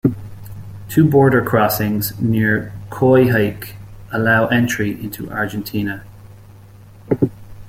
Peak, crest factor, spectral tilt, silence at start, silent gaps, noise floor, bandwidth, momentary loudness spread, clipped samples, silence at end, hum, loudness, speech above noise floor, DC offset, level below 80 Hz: -2 dBFS; 16 dB; -6.5 dB/octave; 0.05 s; none; -41 dBFS; 16.5 kHz; 20 LU; under 0.1%; 0 s; none; -17 LUFS; 25 dB; under 0.1%; -44 dBFS